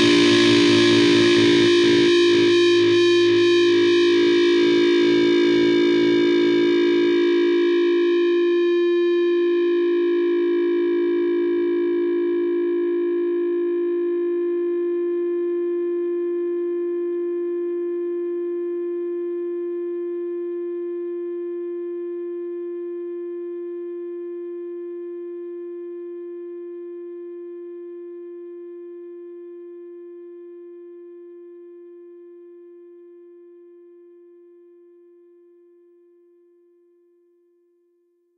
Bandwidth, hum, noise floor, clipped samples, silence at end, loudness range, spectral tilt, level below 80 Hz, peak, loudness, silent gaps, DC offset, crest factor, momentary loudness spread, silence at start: 9.4 kHz; none; -65 dBFS; under 0.1%; 5.15 s; 21 LU; -4.5 dB/octave; -66 dBFS; -6 dBFS; -20 LUFS; none; under 0.1%; 16 dB; 21 LU; 0 s